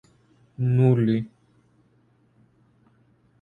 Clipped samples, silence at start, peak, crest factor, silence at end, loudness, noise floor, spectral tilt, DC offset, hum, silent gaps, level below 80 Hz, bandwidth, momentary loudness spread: under 0.1%; 0.6 s; -8 dBFS; 20 dB; 2.15 s; -22 LUFS; -62 dBFS; -10.5 dB/octave; under 0.1%; none; none; -62 dBFS; 4.4 kHz; 10 LU